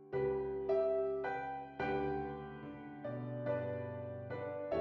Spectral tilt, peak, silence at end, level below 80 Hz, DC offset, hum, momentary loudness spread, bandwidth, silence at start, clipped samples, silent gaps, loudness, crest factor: -9 dB/octave; -24 dBFS; 0 s; -64 dBFS; under 0.1%; none; 11 LU; 5.6 kHz; 0 s; under 0.1%; none; -40 LUFS; 14 dB